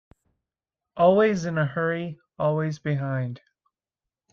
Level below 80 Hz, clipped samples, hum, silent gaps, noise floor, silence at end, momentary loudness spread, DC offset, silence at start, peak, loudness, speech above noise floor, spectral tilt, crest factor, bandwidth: -64 dBFS; under 0.1%; none; none; -89 dBFS; 0.95 s; 16 LU; under 0.1%; 0.95 s; -8 dBFS; -24 LUFS; 66 dB; -7.5 dB/octave; 18 dB; 7.4 kHz